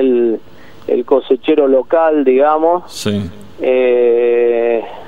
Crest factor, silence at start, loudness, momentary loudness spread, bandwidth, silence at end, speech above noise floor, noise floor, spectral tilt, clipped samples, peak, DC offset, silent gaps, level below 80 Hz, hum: 12 dB; 0 s; -13 LUFS; 9 LU; 13 kHz; 0.05 s; 28 dB; -40 dBFS; -6 dB/octave; under 0.1%; 0 dBFS; 2%; none; -52 dBFS; none